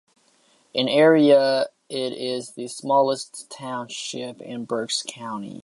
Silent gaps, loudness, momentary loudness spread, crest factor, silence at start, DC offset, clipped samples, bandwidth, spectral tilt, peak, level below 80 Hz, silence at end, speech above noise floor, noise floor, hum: none; -22 LUFS; 17 LU; 18 dB; 0.75 s; under 0.1%; under 0.1%; 11.5 kHz; -4 dB/octave; -4 dBFS; -76 dBFS; 0.05 s; 39 dB; -61 dBFS; none